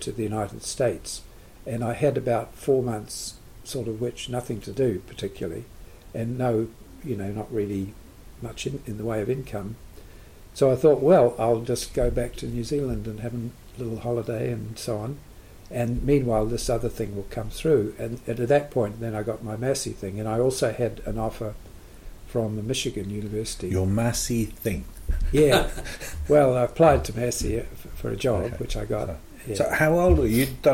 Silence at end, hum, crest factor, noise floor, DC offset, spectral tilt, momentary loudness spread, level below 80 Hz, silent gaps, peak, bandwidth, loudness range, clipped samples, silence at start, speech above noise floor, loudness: 0 s; none; 20 dB; -45 dBFS; under 0.1%; -5.5 dB/octave; 15 LU; -38 dBFS; none; -6 dBFS; 16.5 kHz; 8 LU; under 0.1%; 0 s; 21 dB; -26 LUFS